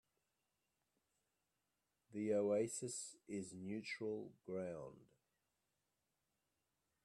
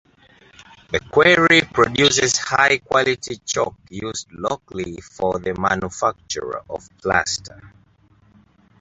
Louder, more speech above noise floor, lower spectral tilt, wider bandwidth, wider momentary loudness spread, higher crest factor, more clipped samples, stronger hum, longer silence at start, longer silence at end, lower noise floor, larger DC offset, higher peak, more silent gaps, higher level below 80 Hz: second, -45 LUFS vs -19 LUFS; first, 45 dB vs 36 dB; first, -4.5 dB/octave vs -3 dB/octave; first, 12.5 kHz vs 8.2 kHz; second, 11 LU vs 15 LU; about the same, 20 dB vs 20 dB; neither; neither; first, 2.1 s vs 0.9 s; first, 2 s vs 1.15 s; first, -89 dBFS vs -55 dBFS; neither; second, -28 dBFS vs 0 dBFS; neither; second, -86 dBFS vs -48 dBFS